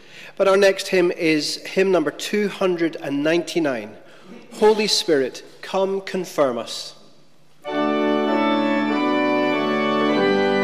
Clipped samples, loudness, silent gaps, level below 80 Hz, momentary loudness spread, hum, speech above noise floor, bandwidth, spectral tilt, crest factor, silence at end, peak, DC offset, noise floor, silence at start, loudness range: under 0.1%; -20 LUFS; none; -62 dBFS; 11 LU; none; 36 dB; 16 kHz; -4 dB/octave; 14 dB; 0 s; -8 dBFS; 0.4%; -56 dBFS; 0.15 s; 3 LU